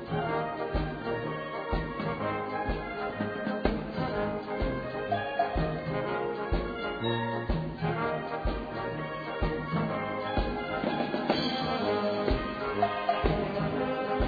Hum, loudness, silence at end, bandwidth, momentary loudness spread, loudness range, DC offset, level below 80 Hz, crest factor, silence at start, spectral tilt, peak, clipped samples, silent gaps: none; -32 LUFS; 0 s; 5 kHz; 5 LU; 3 LU; under 0.1%; -40 dBFS; 20 dB; 0 s; -8 dB/octave; -12 dBFS; under 0.1%; none